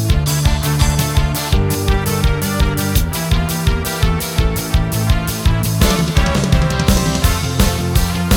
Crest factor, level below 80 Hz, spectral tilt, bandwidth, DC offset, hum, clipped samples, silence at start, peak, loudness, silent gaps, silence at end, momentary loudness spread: 14 dB; -20 dBFS; -5 dB/octave; over 20 kHz; 0.1%; none; under 0.1%; 0 s; 0 dBFS; -16 LUFS; none; 0 s; 3 LU